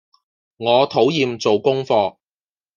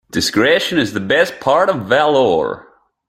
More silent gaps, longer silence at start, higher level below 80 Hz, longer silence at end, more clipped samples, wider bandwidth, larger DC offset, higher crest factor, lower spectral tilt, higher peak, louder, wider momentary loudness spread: neither; first, 0.6 s vs 0.15 s; second, -66 dBFS vs -52 dBFS; first, 0.65 s vs 0.45 s; neither; second, 7.2 kHz vs 15.5 kHz; neither; about the same, 18 dB vs 14 dB; first, -5.5 dB/octave vs -4 dB/octave; about the same, -2 dBFS vs 0 dBFS; second, -18 LUFS vs -15 LUFS; about the same, 5 LU vs 5 LU